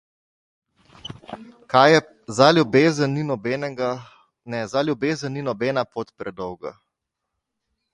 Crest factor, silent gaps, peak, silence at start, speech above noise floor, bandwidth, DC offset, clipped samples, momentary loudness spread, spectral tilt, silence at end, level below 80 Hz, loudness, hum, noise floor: 22 dB; none; 0 dBFS; 1.05 s; 60 dB; 11.5 kHz; under 0.1%; under 0.1%; 22 LU; -5.5 dB/octave; 1.25 s; -62 dBFS; -21 LUFS; none; -81 dBFS